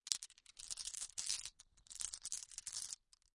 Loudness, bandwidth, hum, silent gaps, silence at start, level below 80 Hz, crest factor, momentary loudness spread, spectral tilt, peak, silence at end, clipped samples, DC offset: -45 LUFS; 12 kHz; none; none; 0.05 s; -74 dBFS; 36 dB; 12 LU; 3 dB/octave; -12 dBFS; 0.4 s; under 0.1%; under 0.1%